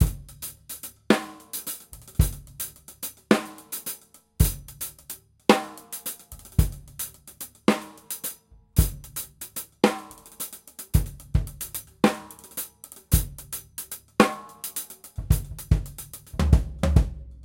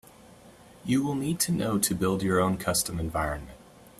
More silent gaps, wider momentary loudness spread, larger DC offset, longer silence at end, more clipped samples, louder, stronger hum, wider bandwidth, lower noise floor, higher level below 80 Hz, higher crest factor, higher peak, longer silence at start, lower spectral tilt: neither; first, 15 LU vs 8 LU; neither; second, 0 s vs 0.15 s; neither; about the same, -28 LUFS vs -27 LUFS; neither; about the same, 17 kHz vs 15.5 kHz; second, -44 dBFS vs -52 dBFS; first, -32 dBFS vs -48 dBFS; first, 26 dB vs 18 dB; first, -2 dBFS vs -10 dBFS; second, 0 s vs 0.3 s; about the same, -5 dB/octave vs -4.5 dB/octave